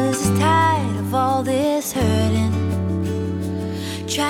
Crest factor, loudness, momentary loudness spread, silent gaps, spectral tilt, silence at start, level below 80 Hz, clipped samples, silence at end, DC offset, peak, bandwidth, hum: 14 dB; -20 LUFS; 9 LU; none; -5.5 dB/octave; 0 s; -44 dBFS; under 0.1%; 0 s; under 0.1%; -6 dBFS; 17 kHz; none